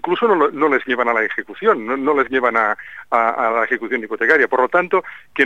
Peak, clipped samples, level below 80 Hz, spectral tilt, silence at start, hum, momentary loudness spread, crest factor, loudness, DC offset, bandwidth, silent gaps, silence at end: -2 dBFS; under 0.1%; -62 dBFS; -5.5 dB/octave; 0.05 s; none; 6 LU; 16 dB; -17 LUFS; 0.4%; 7.6 kHz; none; 0 s